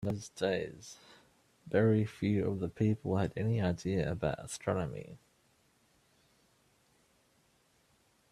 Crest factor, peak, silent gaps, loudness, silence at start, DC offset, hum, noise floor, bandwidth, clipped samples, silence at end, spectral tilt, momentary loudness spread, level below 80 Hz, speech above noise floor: 20 dB; -16 dBFS; none; -34 LUFS; 0 s; under 0.1%; none; -71 dBFS; 12.5 kHz; under 0.1%; 3.15 s; -7 dB/octave; 15 LU; -62 dBFS; 38 dB